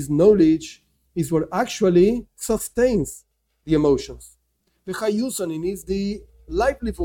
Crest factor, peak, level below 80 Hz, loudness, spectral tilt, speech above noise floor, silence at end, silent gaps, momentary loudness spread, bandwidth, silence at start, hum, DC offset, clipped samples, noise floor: 16 dB; -4 dBFS; -42 dBFS; -21 LUFS; -6 dB/octave; 49 dB; 0 s; none; 16 LU; 17 kHz; 0 s; none; under 0.1%; under 0.1%; -69 dBFS